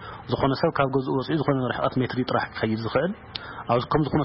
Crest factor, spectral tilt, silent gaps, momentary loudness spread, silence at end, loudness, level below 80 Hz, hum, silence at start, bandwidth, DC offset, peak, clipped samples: 18 dB; -11 dB/octave; none; 7 LU; 0 s; -25 LUFS; -50 dBFS; none; 0 s; 5.8 kHz; under 0.1%; -6 dBFS; under 0.1%